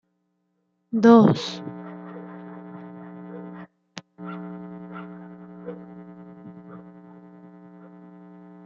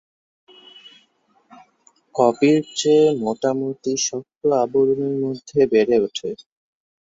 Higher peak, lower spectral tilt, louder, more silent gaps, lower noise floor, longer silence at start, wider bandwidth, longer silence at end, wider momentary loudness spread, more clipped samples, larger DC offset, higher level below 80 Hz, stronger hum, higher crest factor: about the same, -4 dBFS vs -2 dBFS; first, -7.5 dB/octave vs -4.5 dB/octave; about the same, -19 LUFS vs -19 LUFS; neither; first, -73 dBFS vs -62 dBFS; about the same, 0.9 s vs 0.85 s; about the same, 7.4 kHz vs 8 kHz; first, 0.8 s vs 0.65 s; first, 28 LU vs 9 LU; neither; neither; second, -72 dBFS vs -64 dBFS; neither; about the same, 22 dB vs 18 dB